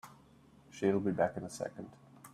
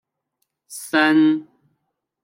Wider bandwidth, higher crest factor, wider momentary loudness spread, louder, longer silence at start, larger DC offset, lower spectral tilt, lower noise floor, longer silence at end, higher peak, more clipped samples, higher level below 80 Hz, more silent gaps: second, 14.5 kHz vs 16 kHz; about the same, 20 dB vs 18 dB; first, 23 LU vs 20 LU; second, -35 LUFS vs -18 LUFS; second, 0.05 s vs 0.7 s; neither; first, -6.5 dB/octave vs -4 dB/octave; second, -62 dBFS vs -75 dBFS; second, 0.05 s vs 0.8 s; second, -18 dBFS vs -4 dBFS; neither; first, -70 dBFS vs -78 dBFS; neither